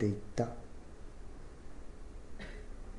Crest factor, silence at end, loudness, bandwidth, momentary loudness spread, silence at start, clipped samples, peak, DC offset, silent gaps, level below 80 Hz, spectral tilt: 20 dB; 0 s; -44 LUFS; 11 kHz; 16 LU; 0 s; under 0.1%; -20 dBFS; under 0.1%; none; -48 dBFS; -7 dB/octave